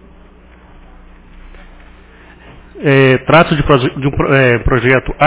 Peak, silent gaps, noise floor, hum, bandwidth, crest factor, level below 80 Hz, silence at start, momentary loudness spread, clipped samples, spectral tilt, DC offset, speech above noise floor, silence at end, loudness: 0 dBFS; none; -40 dBFS; 60 Hz at -45 dBFS; 4 kHz; 14 dB; -30 dBFS; 1.45 s; 6 LU; 0.3%; -10.5 dB/octave; under 0.1%; 30 dB; 0 s; -11 LUFS